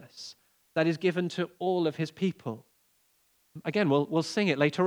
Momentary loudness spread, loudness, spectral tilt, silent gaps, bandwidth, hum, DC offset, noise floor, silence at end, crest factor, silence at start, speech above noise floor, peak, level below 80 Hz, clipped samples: 16 LU; -29 LUFS; -6 dB/octave; none; over 20 kHz; none; under 0.1%; -69 dBFS; 0 s; 20 dB; 0 s; 41 dB; -10 dBFS; -82 dBFS; under 0.1%